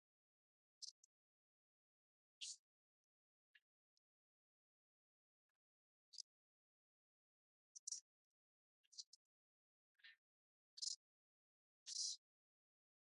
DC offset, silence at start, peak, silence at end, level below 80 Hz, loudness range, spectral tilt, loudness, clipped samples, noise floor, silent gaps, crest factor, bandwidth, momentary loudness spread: under 0.1%; 0.8 s; -34 dBFS; 0.85 s; under -90 dBFS; 15 LU; 7 dB/octave; -52 LUFS; under 0.1%; under -90 dBFS; 0.91-2.41 s, 2.59-3.54 s, 3.62-6.12 s, 6.23-7.87 s, 8.01-8.92 s, 9.06-9.95 s, 10.18-10.77 s, 10.96-11.86 s; 28 dB; 10.5 kHz; 20 LU